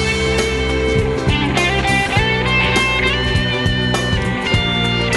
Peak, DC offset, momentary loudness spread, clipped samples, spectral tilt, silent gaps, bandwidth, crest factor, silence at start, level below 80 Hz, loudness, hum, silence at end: -2 dBFS; 0.1%; 3 LU; under 0.1%; -4.5 dB/octave; none; 12.5 kHz; 14 dB; 0 s; -26 dBFS; -16 LUFS; none; 0 s